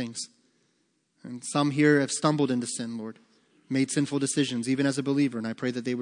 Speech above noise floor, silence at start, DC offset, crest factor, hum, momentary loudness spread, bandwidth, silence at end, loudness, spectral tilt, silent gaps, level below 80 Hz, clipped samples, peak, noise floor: 45 dB; 0 s; under 0.1%; 20 dB; none; 15 LU; 10.5 kHz; 0 s; -27 LUFS; -5 dB/octave; none; -80 dBFS; under 0.1%; -8 dBFS; -72 dBFS